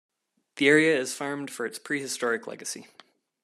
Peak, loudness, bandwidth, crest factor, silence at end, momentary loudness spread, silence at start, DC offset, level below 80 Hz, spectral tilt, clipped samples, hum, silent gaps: -6 dBFS; -26 LUFS; 13.5 kHz; 22 dB; 0.6 s; 16 LU; 0.55 s; under 0.1%; -80 dBFS; -3.5 dB/octave; under 0.1%; none; none